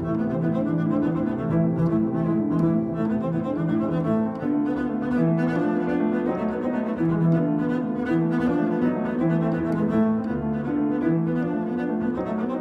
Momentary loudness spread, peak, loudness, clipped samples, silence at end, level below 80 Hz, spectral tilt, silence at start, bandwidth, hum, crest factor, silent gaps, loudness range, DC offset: 4 LU; -10 dBFS; -24 LUFS; under 0.1%; 0 s; -50 dBFS; -10 dB/octave; 0 s; 5.4 kHz; none; 12 dB; none; 1 LU; under 0.1%